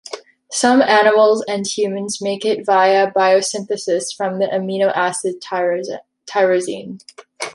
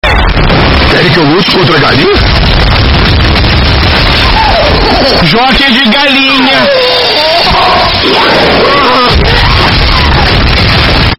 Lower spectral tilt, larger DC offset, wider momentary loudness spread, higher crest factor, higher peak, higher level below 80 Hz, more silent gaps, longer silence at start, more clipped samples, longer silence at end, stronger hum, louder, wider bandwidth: second, -3.5 dB/octave vs -6 dB/octave; neither; first, 17 LU vs 2 LU; first, 16 dB vs 6 dB; about the same, -2 dBFS vs 0 dBFS; second, -68 dBFS vs -12 dBFS; neither; about the same, 0.05 s vs 0.05 s; second, under 0.1% vs 2%; about the same, 0 s vs 0.05 s; neither; second, -17 LUFS vs -5 LUFS; second, 11.5 kHz vs 16.5 kHz